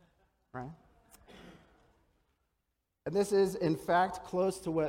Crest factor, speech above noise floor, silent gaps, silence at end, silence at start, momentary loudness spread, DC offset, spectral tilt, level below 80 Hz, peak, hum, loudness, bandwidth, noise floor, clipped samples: 18 dB; 52 dB; none; 0 s; 0.55 s; 17 LU; under 0.1%; -6 dB/octave; -66 dBFS; -18 dBFS; none; -31 LUFS; 16.5 kHz; -83 dBFS; under 0.1%